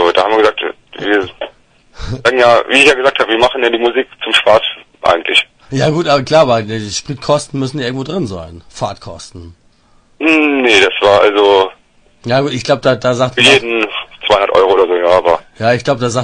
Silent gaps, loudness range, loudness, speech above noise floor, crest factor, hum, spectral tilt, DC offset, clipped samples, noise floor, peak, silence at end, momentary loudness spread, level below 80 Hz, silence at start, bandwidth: none; 6 LU; -11 LUFS; 38 dB; 12 dB; none; -4 dB/octave; under 0.1%; 0.2%; -49 dBFS; 0 dBFS; 0 s; 14 LU; -42 dBFS; 0 s; 12 kHz